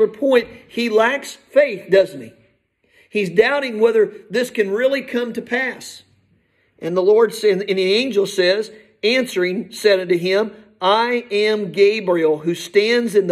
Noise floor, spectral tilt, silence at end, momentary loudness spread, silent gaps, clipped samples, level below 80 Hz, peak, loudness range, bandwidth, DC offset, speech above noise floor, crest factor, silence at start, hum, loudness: -61 dBFS; -4.5 dB/octave; 0 s; 8 LU; none; under 0.1%; -66 dBFS; -2 dBFS; 2 LU; 14 kHz; under 0.1%; 44 dB; 16 dB; 0 s; none; -18 LUFS